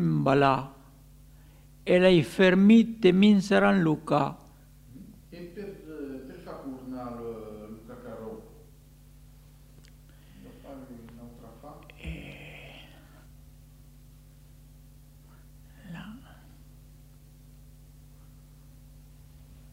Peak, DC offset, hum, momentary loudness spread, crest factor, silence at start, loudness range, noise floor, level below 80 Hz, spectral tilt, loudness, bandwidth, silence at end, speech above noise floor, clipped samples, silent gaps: -6 dBFS; under 0.1%; none; 28 LU; 22 dB; 0 s; 28 LU; -53 dBFS; -54 dBFS; -7 dB/octave; -23 LUFS; 15.5 kHz; 3.55 s; 31 dB; under 0.1%; none